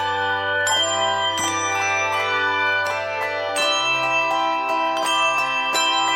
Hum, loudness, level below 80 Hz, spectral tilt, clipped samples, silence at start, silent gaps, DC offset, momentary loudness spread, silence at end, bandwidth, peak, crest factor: none; -20 LUFS; -66 dBFS; -1 dB/octave; under 0.1%; 0 s; none; under 0.1%; 3 LU; 0 s; 16.5 kHz; -8 dBFS; 14 dB